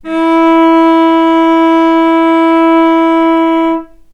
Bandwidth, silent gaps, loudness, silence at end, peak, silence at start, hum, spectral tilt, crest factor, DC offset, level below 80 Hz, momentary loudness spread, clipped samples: 6 kHz; none; -8 LUFS; 0.3 s; 0 dBFS; 0.05 s; none; -5 dB/octave; 8 dB; under 0.1%; -48 dBFS; 4 LU; under 0.1%